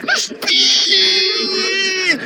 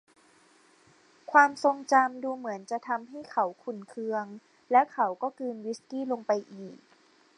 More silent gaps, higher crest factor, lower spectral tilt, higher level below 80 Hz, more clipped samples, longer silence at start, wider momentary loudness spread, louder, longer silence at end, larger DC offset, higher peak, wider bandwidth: neither; second, 14 dB vs 24 dB; second, 0.5 dB/octave vs -4.5 dB/octave; first, -68 dBFS vs -86 dBFS; neither; second, 0 s vs 1.3 s; second, 6 LU vs 15 LU; first, -12 LUFS vs -28 LUFS; second, 0 s vs 0.65 s; neither; first, 0 dBFS vs -6 dBFS; first, over 20 kHz vs 11 kHz